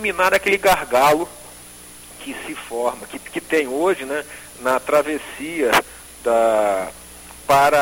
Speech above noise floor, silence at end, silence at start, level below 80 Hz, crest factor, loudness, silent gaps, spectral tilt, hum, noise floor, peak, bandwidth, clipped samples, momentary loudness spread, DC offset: 22 dB; 0 s; 0 s; -50 dBFS; 16 dB; -19 LUFS; none; -3 dB/octave; none; -41 dBFS; -4 dBFS; 17 kHz; under 0.1%; 21 LU; under 0.1%